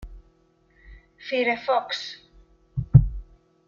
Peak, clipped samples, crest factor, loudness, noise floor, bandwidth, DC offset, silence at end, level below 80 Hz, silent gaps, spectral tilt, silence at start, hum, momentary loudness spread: -2 dBFS; under 0.1%; 24 dB; -23 LUFS; -62 dBFS; 7.2 kHz; under 0.1%; 0.45 s; -38 dBFS; none; -7.5 dB/octave; 0 s; none; 22 LU